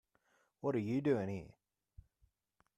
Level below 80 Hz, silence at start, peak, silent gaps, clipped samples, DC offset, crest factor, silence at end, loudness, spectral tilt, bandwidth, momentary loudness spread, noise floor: -70 dBFS; 0.65 s; -22 dBFS; none; under 0.1%; under 0.1%; 20 dB; 1.25 s; -38 LUFS; -8.5 dB/octave; 10.5 kHz; 13 LU; -80 dBFS